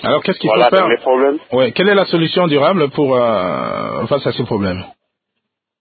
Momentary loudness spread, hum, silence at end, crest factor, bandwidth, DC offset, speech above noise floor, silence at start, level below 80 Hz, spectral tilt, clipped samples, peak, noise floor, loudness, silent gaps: 8 LU; none; 0.9 s; 14 dB; 4.8 kHz; under 0.1%; 61 dB; 0 s; -48 dBFS; -9.5 dB/octave; under 0.1%; 0 dBFS; -76 dBFS; -14 LUFS; none